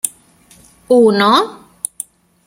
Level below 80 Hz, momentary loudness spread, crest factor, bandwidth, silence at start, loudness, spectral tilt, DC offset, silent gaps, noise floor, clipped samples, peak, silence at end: -58 dBFS; 18 LU; 16 dB; 16.5 kHz; 0.05 s; -13 LUFS; -3.5 dB/octave; under 0.1%; none; -48 dBFS; under 0.1%; 0 dBFS; 0.9 s